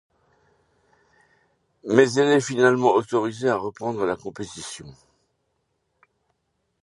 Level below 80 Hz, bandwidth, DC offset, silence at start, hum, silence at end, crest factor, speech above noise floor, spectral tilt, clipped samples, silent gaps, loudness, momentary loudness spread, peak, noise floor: -64 dBFS; 11.5 kHz; under 0.1%; 1.85 s; none; 1.9 s; 24 dB; 53 dB; -5 dB/octave; under 0.1%; none; -21 LUFS; 17 LU; -2 dBFS; -74 dBFS